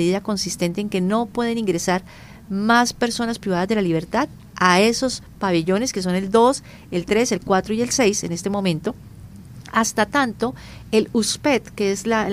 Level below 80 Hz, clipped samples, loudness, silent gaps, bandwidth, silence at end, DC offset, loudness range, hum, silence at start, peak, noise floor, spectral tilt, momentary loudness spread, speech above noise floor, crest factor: -48 dBFS; under 0.1%; -21 LUFS; none; 16 kHz; 0 s; under 0.1%; 3 LU; none; 0 s; 0 dBFS; -40 dBFS; -4 dB/octave; 10 LU; 19 dB; 20 dB